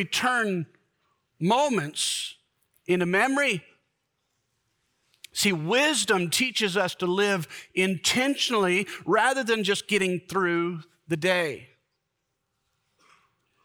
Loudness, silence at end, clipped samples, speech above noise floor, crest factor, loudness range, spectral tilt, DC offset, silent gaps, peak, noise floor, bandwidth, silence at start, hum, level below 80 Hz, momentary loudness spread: -25 LUFS; 2 s; under 0.1%; 54 dB; 18 dB; 5 LU; -3.5 dB/octave; under 0.1%; none; -8 dBFS; -79 dBFS; over 20 kHz; 0 s; none; -70 dBFS; 10 LU